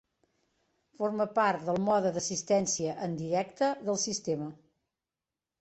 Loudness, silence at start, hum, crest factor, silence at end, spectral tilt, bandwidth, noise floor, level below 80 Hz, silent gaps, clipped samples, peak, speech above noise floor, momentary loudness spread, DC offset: -30 LUFS; 1 s; none; 18 dB; 1.05 s; -4 dB/octave; 8.4 kHz; under -90 dBFS; -70 dBFS; none; under 0.1%; -14 dBFS; over 60 dB; 7 LU; under 0.1%